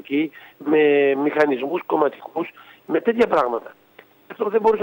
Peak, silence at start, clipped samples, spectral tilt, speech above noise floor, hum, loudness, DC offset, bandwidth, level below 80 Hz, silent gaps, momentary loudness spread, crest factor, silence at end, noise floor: -2 dBFS; 0.1 s; under 0.1%; -6.5 dB/octave; 27 dB; none; -20 LUFS; under 0.1%; 16 kHz; -62 dBFS; none; 13 LU; 18 dB; 0 s; -47 dBFS